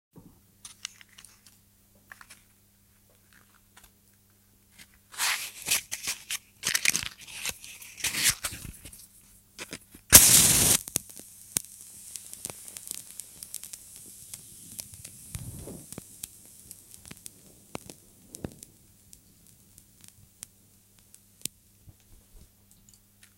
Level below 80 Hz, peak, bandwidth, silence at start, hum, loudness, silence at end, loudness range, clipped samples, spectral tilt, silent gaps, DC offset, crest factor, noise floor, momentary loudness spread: -52 dBFS; 0 dBFS; 17 kHz; 5.15 s; none; -23 LUFS; 4.9 s; 26 LU; under 0.1%; -0.5 dB/octave; none; under 0.1%; 32 dB; -62 dBFS; 25 LU